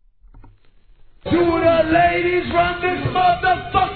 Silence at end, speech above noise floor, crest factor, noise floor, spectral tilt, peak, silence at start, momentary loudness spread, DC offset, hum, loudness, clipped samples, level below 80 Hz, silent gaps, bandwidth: 0 s; 32 dB; 14 dB; -50 dBFS; -9.5 dB/octave; -4 dBFS; 1.25 s; 6 LU; 0.2%; none; -17 LUFS; under 0.1%; -38 dBFS; none; 4.6 kHz